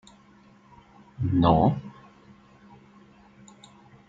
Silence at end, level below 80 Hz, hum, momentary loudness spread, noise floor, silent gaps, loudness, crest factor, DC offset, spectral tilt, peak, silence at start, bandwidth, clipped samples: 2.2 s; -48 dBFS; none; 17 LU; -55 dBFS; none; -23 LUFS; 22 dB; under 0.1%; -9 dB/octave; -6 dBFS; 1.2 s; 7.8 kHz; under 0.1%